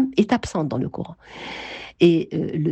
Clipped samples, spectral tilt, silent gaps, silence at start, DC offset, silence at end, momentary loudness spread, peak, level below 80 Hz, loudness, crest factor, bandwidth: under 0.1%; -7 dB/octave; none; 0 s; under 0.1%; 0 s; 17 LU; -4 dBFS; -50 dBFS; -22 LUFS; 18 dB; 8.6 kHz